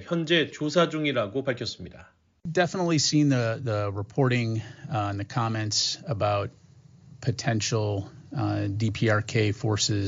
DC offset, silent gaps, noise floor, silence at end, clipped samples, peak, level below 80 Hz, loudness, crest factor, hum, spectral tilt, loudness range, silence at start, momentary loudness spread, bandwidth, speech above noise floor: under 0.1%; none; -53 dBFS; 0 s; under 0.1%; -8 dBFS; -60 dBFS; -26 LUFS; 18 dB; none; -4.5 dB/octave; 3 LU; 0 s; 9 LU; 8 kHz; 27 dB